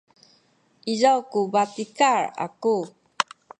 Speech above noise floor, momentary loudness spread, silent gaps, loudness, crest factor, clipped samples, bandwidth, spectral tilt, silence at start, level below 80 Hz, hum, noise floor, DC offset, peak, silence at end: 40 dB; 9 LU; none; -23 LUFS; 22 dB; under 0.1%; 10 kHz; -3.5 dB/octave; 0.85 s; -78 dBFS; none; -62 dBFS; under 0.1%; -2 dBFS; 0.35 s